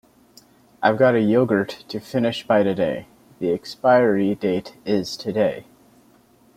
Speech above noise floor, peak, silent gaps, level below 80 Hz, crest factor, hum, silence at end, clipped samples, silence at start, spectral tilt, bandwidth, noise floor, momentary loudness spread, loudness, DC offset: 35 dB; -2 dBFS; none; -60 dBFS; 20 dB; none; 0.95 s; under 0.1%; 0.8 s; -6.5 dB/octave; 15.5 kHz; -55 dBFS; 11 LU; -21 LUFS; under 0.1%